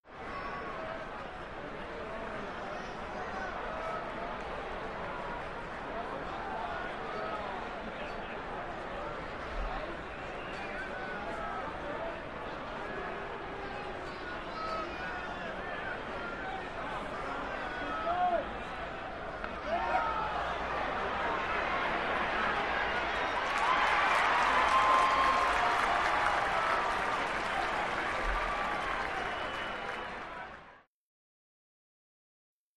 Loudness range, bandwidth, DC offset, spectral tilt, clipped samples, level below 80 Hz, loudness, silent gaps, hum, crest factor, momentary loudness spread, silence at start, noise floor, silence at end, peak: 12 LU; 13 kHz; 0.1%; -4 dB/octave; under 0.1%; -50 dBFS; -34 LUFS; none; none; 22 dB; 13 LU; 0 s; -56 dBFS; 0 s; -12 dBFS